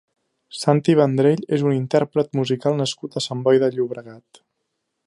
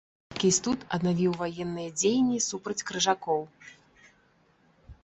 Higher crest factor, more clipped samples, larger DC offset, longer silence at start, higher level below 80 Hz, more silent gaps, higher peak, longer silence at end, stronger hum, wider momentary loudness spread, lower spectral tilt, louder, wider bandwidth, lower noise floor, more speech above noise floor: about the same, 20 dB vs 18 dB; neither; neither; first, 0.55 s vs 0.3 s; second, -68 dBFS vs -60 dBFS; neither; first, -2 dBFS vs -10 dBFS; first, 0.85 s vs 0.1 s; neither; about the same, 10 LU vs 9 LU; first, -6.5 dB/octave vs -4 dB/octave; first, -20 LUFS vs -28 LUFS; first, 11.5 kHz vs 8.6 kHz; first, -76 dBFS vs -65 dBFS; first, 57 dB vs 37 dB